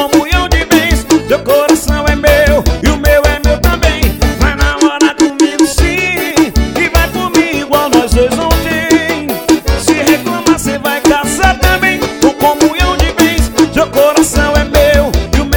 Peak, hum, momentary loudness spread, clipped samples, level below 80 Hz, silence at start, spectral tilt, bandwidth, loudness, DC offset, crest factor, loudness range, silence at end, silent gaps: 0 dBFS; none; 3 LU; 0.7%; -16 dBFS; 0 s; -4.5 dB/octave; 20 kHz; -10 LUFS; 0.3%; 10 dB; 1 LU; 0 s; none